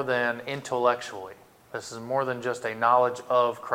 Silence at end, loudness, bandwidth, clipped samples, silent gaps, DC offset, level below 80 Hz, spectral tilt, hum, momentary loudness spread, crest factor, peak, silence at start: 0 s; -26 LUFS; 16.5 kHz; under 0.1%; none; under 0.1%; -72 dBFS; -4.5 dB/octave; none; 16 LU; 18 dB; -8 dBFS; 0 s